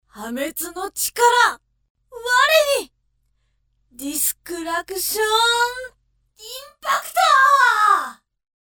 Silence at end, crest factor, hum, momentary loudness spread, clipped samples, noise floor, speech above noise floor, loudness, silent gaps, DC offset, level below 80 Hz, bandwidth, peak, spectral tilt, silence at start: 0.55 s; 20 dB; none; 19 LU; under 0.1%; -67 dBFS; 48 dB; -18 LUFS; 1.90-1.95 s; under 0.1%; -58 dBFS; over 20 kHz; 0 dBFS; 0.5 dB/octave; 0.15 s